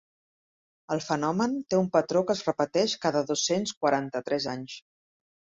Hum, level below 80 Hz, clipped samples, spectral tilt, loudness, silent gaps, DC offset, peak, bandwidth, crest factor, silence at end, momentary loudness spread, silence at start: none; -68 dBFS; under 0.1%; -4.5 dB/octave; -27 LUFS; 3.77-3.81 s; under 0.1%; -8 dBFS; 8 kHz; 20 dB; 0.8 s; 9 LU; 0.9 s